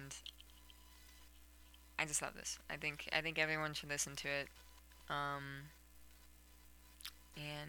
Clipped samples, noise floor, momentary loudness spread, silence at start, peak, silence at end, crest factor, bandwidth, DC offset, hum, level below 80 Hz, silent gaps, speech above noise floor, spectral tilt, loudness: under 0.1%; -64 dBFS; 25 LU; 0 s; -20 dBFS; 0 s; 26 dB; 19 kHz; under 0.1%; 60 Hz at -65 dBFS; -66 dBFS; none; 21 dB; -2 dB/octave; -42 LUFS